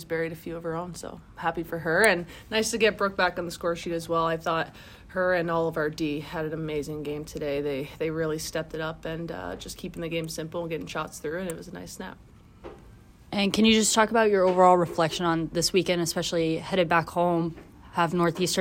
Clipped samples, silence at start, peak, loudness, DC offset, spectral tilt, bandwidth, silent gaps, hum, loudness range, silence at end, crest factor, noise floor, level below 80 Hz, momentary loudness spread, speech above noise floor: under 0.1%; 0 s; -6 dBFS; -26 LUFS; under 0.1%; -4 dB/octave; 16 kHz; none; none; 11 LU; 0 s; 22 dB; -51 dBFS; -52 dBFS; 14 LU; 24 dB